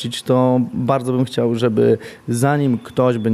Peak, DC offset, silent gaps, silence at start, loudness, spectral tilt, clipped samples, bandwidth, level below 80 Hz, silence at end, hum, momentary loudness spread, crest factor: -2 dBFS; under 0.1%; none; 0 s; -18 LUFS; -7 dB/octave; under 0.1%; 14.5 kHz; -58 dBFS; 0 s; none; 4 LU; 14 dB